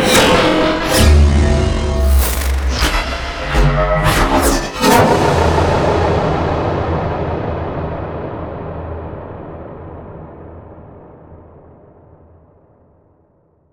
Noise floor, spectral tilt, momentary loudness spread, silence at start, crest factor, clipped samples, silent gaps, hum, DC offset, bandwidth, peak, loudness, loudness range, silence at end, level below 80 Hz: -55 dBFS; -5 dB/octave; 20 LU; 0 s; 16 dB; under 0.1%; none; none; under 0.1%; over 20 kHz; 0 dBFS; -15 LUFS; 18 LU; 2.35 s; -22 dBFS